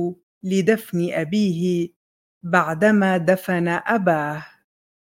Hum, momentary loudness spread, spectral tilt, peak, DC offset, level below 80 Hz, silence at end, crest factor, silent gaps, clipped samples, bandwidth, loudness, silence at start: none; 11 LU; -6.5 dB/octave; -2 dBFS; under 0.1%; -64 dBFS; 0.6 s; 20 dB; 0.23-0.41 s, 1.96-2.41 s; under 0.1%; 17 kHz; -20 LUFS; 0 s